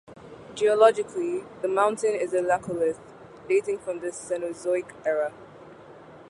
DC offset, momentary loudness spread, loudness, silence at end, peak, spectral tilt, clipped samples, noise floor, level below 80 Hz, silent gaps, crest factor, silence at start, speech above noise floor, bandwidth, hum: under 0.1%; 13 LU; -26 LUFS; 0.05 s; -6 dBFS; -4.5 dB/octave; under 0.1%; -47 dBFS; -66 dBFS; none; 20 dB; 0.1 s; 22 dB; 11.5 kHz; none